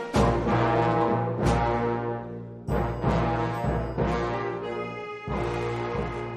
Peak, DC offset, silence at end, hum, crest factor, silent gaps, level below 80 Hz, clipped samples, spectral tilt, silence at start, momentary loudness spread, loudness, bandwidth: -10 dBFS; under 0.1%; 0 s; none; 18 dB; none; -38 dBFS; under 0.1%; -7.5 dB/octave; 0 s; 9 LU; -27 LUFS; 12.5 kHz